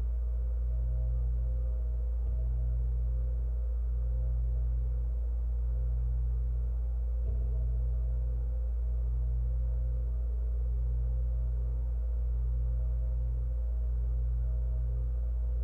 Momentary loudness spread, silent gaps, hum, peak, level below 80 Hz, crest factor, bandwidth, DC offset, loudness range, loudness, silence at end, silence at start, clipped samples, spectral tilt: 1 LU; none; none; -24 dBFS; -30 dBFS; 6 dB; 1.5 kHz; under 0.1%; 0 LU; -34 LUFS; 0 s; 0 s; under 0.1%; -11 dB/octave